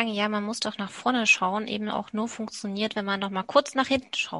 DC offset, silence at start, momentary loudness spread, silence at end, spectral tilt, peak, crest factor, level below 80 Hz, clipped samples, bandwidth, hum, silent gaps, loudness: under 0.1%; 0 s; 10 LU; 0 s; -3.5 dB/octave; -4 dBFS; 22 dB; -64 dBFS; under 0.1%; 11.5 kHz; none; none; -26 LUFS